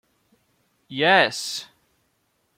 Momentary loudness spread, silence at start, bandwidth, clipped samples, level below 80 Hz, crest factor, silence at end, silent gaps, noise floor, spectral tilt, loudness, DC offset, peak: 16 LU; 0.9 s; 16.5 kHz; under 0.1%; -72 dBFS; 22 dB; 0.95 s; none; -70 dBFS; -2.5 dB/octave; -20 LUFS; under 0.1%; -4 dBFS